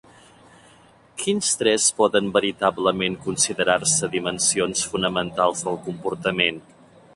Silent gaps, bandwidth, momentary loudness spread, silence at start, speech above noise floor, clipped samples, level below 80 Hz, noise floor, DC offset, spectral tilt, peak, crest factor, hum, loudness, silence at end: none; 11.5 kHz; 10 LU; 1.15 s; 30 dB; under 0.1%; -56 dBFS; -52 dBFS; under 0.1%; -2.5 dB/octave; -2 dBFS; 20 dB; none; -21 LUFS; 0.55 s